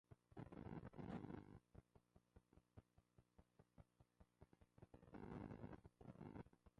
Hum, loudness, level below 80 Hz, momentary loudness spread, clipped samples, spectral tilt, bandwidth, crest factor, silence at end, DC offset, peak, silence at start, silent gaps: none; -59 LUFS; -74 dBFS; 10 LU; under 0.1%; -8 dB/octave; 5.8 kHz; 20 dB; 0.1 s; under 0.1%; -42 dBFS; 0.1 s; none